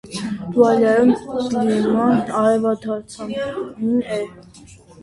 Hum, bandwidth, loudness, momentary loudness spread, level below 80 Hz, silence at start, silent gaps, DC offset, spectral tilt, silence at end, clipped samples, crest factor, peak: none; 11.5 kHz; -19 LUFS; 13 LU; -54 dBFS; 0.05 s; none; under 0.1%; -6.5 dB/octave; 0.3 s; under 0.1%; 16 dB; -2 dBFS